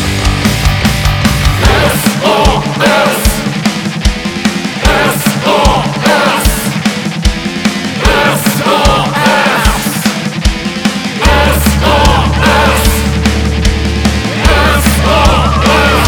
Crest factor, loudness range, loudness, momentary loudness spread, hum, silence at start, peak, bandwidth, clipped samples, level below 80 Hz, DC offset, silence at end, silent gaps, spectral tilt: 10 dB; 1 LU; -10 LUFS; 6 LU; none; 0 s; 0 dBFS; over 20 kHz; 0.5%; -16 dBFS; under 0.1%; 0 s; none; -4.5 dB/octave